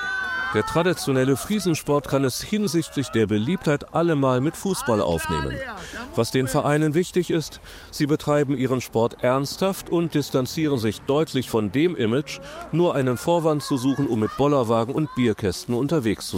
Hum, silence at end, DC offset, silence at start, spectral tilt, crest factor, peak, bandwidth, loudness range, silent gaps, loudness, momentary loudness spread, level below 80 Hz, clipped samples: none; 0 s; under 0.1%; 0 s; -5.5 dB/octave; 16 dB; -8 dBFS; 16.5 kHz; 1 LU; none; -23 LUFS; 5 LU; -48 dBFS; under 0.1%